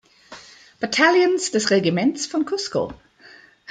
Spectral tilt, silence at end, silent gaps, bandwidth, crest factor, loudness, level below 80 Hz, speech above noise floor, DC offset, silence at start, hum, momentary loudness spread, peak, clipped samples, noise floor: -4 dB/octave; 0.75 s; none; 9.4 kHz; 20 dB; -20 LUFS; -60 dBFS; 29 dB; under 0.1%; 0.3 s; none; 15 LU; -2 dBFS; under 0.1%; -49 dBFS